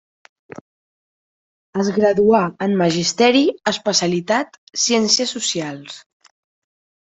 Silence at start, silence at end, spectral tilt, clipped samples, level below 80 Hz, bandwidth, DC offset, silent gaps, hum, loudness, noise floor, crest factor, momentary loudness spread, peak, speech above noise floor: 1.75 s; 1.1 s; -3.5 dB/octave; under 0.1%; -60 dBFS; 8.4 kHz; under 0.1%; 4.58-4.67 s; none; -17 LUFS; under -90 dBFS; 18 dB; 14 LU; -2 dBFS; over 72 dB